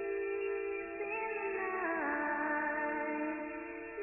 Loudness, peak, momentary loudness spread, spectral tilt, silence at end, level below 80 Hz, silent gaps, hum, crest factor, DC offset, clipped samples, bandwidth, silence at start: -36 LUFS; -24 dBFS; 6 LU; -3.5 dB/octave; 0 s; -70 dBFS; none; none; 14 dB; under 0.1%; under 0.1%; 2.9 kHz; 0 s